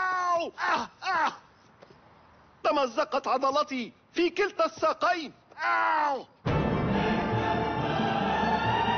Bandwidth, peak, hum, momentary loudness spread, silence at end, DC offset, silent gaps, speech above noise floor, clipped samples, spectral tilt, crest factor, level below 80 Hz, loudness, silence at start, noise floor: 6.6 kHz; -14 dBFS; none; 5 LU; 0 s; under 0.1%; none; 29 dB; under 0.1%; -3.5 dB/octave; 14 dB; -50 dBFS; -28 LUFS; 0 s; -57 dBFS